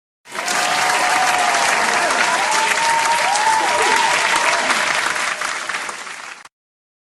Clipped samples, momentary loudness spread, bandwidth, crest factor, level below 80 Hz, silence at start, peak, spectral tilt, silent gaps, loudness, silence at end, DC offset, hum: under 0.1%; 10 LU; 13 kHz; 18 dB; -60 dBFS; 0.25 s; 0 dBFS; 0 dB/octave; none; -16 LUFS; 0.7 s; under 0.1%; none